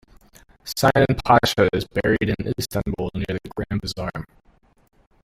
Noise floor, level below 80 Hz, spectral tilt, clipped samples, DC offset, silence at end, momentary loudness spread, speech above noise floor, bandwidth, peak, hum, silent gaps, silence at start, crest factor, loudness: -52 dBFS; -42 dBFS; -5.5 dB/octave; under 0.1%; under 0.1%; 1 s; 13 LU; 31 dB; 16 kHz; -2 dBFS; none; none; 0.65 s; 20 dB; -22 LUFS